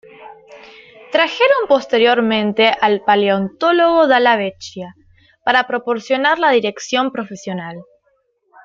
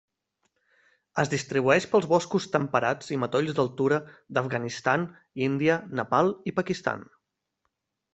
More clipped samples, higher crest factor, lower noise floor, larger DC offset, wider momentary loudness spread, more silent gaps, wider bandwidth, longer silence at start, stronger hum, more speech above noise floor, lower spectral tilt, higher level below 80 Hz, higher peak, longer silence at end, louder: neither; second, 16 dB vs 22 dB; second, -63 dBFS vs -80 dBFS; neither; first, 14 LU vs 8 LU; neither; about the same, 7.6 kHz vs 8.2 kHz; second, 0.2 s vs 1.15 s; neither; second, 48 dB vs 54 dB; about the same, -4.5 dB/octave vs -5.5 dB/octave; first, -60 dBFS vs -66 dBFS; first, 0 dBFS vs -6 dBFS; second, 0.8 s vs 1.1 s; first, -15 LUFS vs -26 LUFS